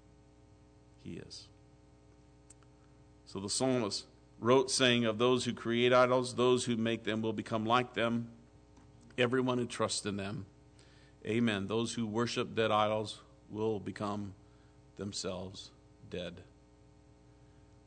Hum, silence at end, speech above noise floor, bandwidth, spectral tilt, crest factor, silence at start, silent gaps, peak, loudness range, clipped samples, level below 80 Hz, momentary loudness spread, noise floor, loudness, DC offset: 60 Hz at -60 dBFS; 1.45 s; 29 dB; 9.4 kHz; -4.5 dB/octave; 20 dB; 1.05 s; none; -14 dBFS; 13 LU; under 0.1%; -66 dBFS; 19 LU; -61 dBFS; -33 LUFS; under 0.1%